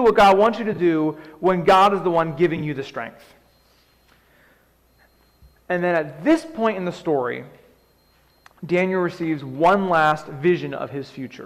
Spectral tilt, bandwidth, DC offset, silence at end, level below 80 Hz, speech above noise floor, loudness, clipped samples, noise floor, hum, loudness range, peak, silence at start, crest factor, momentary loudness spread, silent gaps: -6.5 dB/octave; 14.5 kHz; under 0.1%; 0 s; -54 dBFS; 39 dB; -20 LUFS; under 0.1%; -59 dBFS; none; 10 LU; -6 dBFS; 0 s; 16 dB; 15 LU; none